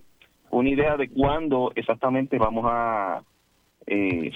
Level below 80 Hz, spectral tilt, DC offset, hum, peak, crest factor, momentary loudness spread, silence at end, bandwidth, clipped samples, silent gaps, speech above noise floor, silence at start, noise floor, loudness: -44 dBFS; -8.5 dB/octave; under 0.1%; none; -8 dBFS; 16 dB; 6 LU; 0 s; 4.8 kHz; under 0.1%; none; 42 dB; 0.5 s; -65 dBFS; -24 LUFS